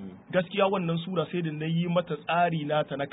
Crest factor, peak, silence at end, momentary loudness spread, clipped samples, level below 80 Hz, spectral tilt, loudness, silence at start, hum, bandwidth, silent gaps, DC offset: 16 dB; -12 dBFS; 0 s; 4 LU; under 0.1%; -66 dBFS; -11 dB/octave; -28 LUFS; 0 s; none; 4 kHz; none; under 0.1%